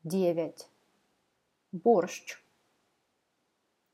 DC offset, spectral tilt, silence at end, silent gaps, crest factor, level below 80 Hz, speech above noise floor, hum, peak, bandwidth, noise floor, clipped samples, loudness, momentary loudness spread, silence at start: under 0.1%; -6 dB/octave; 1.6 s; none; 22 dB; -90 dBFS; 48 dB; none; -12 dBFS; 14.5 kHz; -77 dBFS; under 0.1%; -29 LUFS; 19 LU; 0.05 s